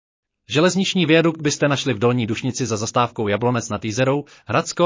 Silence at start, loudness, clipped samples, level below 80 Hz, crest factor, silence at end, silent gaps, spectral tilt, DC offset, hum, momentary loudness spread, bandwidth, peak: 0.5 s; -20 LUFS; under 0.1%; -54 dBFS; 16 dB; 0 s; none; -5 dB/octave; under 0.1%; none; 7 LU; 7.8 kHz; -4 dBFS